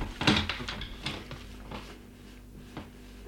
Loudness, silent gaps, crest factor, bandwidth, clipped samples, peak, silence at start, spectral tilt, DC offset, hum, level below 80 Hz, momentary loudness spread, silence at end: -32 LUFS; none; 26 dB; 18.5 kHz; under 0.1%; -10 dBFS; 0 s; -4.5 dB/octave; under 0.1%; 50 Hz at -50 dBFS; -46 dBFS; 23 LU; 0 s